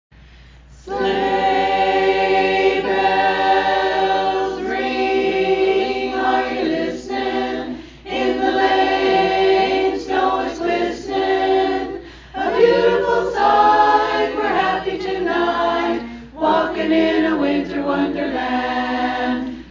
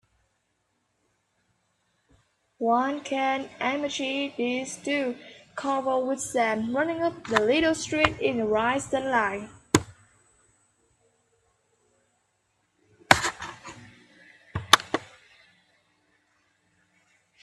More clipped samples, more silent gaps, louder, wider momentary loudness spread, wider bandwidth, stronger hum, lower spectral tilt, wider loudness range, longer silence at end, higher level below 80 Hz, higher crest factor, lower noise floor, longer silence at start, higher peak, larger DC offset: neither; neither; first, -18 LUFS vs -26 LUFS; second, 7 LU vs 15 LU; second, 7.6 kHz vs 15 kHz; neither; first, -5 dB/octave vs -3.5 dB/octave; second, 3 LU vs 6 LU; second, 0 s vs 2.35 s; first, -44 dBFS vs -58 dBFS; second, 16 dB vs 30 dB; second, -43 dBFS vs -74 dBFS; second, 0.7 s vs 2.6 s; about the same, -2 dBFS vs 0 dBFS; neither